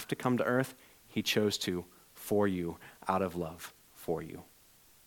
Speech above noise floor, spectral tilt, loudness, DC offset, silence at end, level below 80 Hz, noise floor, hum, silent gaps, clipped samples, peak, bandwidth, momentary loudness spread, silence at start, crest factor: 29 dB; -5 dB/octave; -34 LUFS; under 0.1%; 0.65 s; -66 dBFS; -62 dBFS; none; none; under 0.1%; -14 dBFS; 19 kHz; 17 LU; 0 s; 20 dB